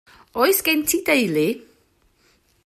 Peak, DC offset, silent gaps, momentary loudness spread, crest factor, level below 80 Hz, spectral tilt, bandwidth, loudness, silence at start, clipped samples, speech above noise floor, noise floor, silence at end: -4 dBFS; under 0.1%; none; 11 LU; 18 dB; -60 dBFS; -3 dB/octave; 16 kHz; -19 LUFS; 0.35 s; under 0.1%; 42 dB; -61 dBFS; 1.05 s